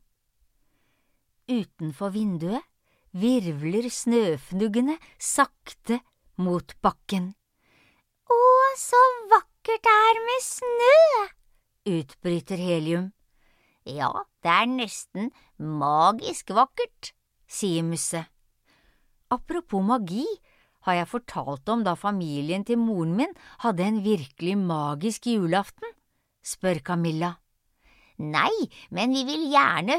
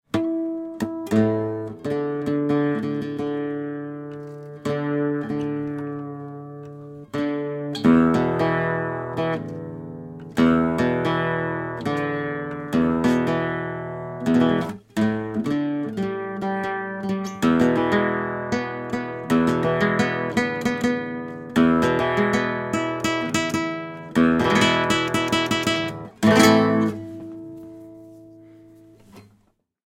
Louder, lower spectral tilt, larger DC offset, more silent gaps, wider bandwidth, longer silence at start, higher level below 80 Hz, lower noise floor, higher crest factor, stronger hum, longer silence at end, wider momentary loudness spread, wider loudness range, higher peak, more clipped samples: about the same, -24 LUFS vs -22 LUFS; about the same, -5 dB/octave vs -5.5 dB/octave; neither; neither; about the same, 16 kHz vs 16 kHz; first, 1.5 s vs 0.15 s; second, -60 dBFS vs -52 dBFS; first, -70 dBFS vs -64 dBFS; about the same, 20 dB vs 20 dB; neither; second, 0 s vs 0.7 s; about the same, 15 LU vs 15 LU; first, 9 LU vs 6 LU; second, -6 dBFS vs -2 dBFS; neither